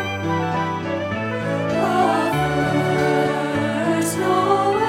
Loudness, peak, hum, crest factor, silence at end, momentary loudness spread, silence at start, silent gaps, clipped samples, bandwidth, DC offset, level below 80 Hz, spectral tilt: -20 LUFS; -6 dBFS; none; 14 dB; 0 s; 6 LU; 0 s; none; under 0.1%; 17 kHz; under 0.1%; -50 dBFS; -5.5 dB/octave